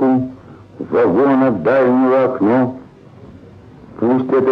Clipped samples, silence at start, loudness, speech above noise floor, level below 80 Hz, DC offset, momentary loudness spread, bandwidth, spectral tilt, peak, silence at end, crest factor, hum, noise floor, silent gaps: under 0.1%; 0 s; -15 LUFS; 26 dB; -54 dBFS; under 0.1%; 9 LU; 5 kHz; -9.5 dB/octave; -4 dBFS; 0 s; 12 dB; none; -40 dBFS; none